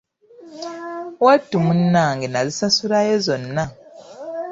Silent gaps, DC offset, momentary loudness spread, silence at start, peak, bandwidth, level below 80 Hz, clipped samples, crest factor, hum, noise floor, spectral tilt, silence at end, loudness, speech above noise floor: none; under 0.1%; 16 LU; 0.4 s; -2 dBFS; 7.8 kHz; -56 dBFS; under 0.1%; 18 dB; none; -45 dBFS; -5 dB/octave; 0 s; -18 LUFS; 27 dB